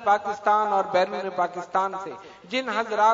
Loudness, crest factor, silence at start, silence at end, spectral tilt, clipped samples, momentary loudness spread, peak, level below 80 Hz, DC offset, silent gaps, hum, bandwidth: -25 LUFS; 16 dB; 0 s; 0 s; -4 dB/octave; under 0.1%; 10 LU; -8 dBFS; -72 dBFS; under 0.1%; none; none; 7.8 kHz